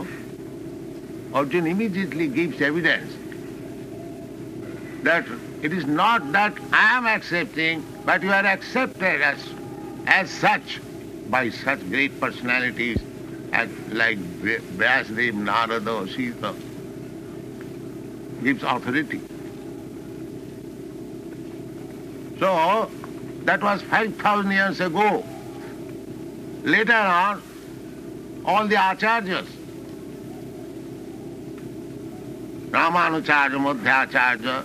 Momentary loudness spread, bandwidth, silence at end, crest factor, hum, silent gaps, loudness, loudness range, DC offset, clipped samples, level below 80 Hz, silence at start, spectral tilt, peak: 18 LU; 15 kHz; 0 s; 22 dB; none; none; -22 LUFS; 8 LU; under 0.1%; under 0.1%; -54 dBFS; 0 s; -5 dB/octave; -2 dBFS